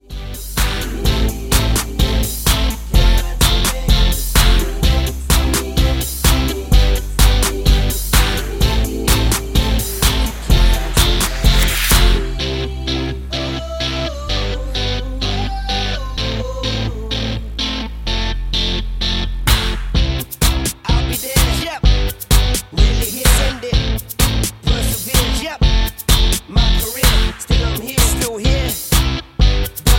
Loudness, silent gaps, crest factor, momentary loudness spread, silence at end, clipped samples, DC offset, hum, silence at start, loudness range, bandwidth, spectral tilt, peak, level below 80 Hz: -17 LUFS; none; 16 dB; 7 LU; 0 s; under 0.1%; under 0.1%; none; 0.1 s; 5 LU; 17 kHz; -3.5 dB/octave; 0 dBFS; -18 dBFS